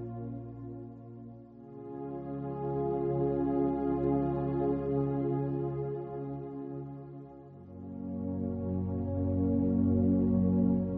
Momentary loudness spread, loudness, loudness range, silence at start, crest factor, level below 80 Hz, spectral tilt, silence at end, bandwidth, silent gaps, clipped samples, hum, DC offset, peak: 20 LU; -32 LUFS; 7 LU; 0 s; 16 dB; -54 dBFS; -12 dB/octave; 0 s; 3.3 kHz; none; under 0.1%; none; under 0.1%; -16 dBFS